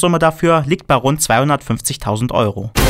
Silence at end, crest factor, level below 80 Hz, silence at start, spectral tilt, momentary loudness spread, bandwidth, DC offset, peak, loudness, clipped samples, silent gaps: 0 s; 12 dB; -30 dBFS; 0 s; -5 dB/octave; 6 LU; 16.5 kHz; under 0.1%; -2 dBFS; -15 LUFS; under 0.1%; none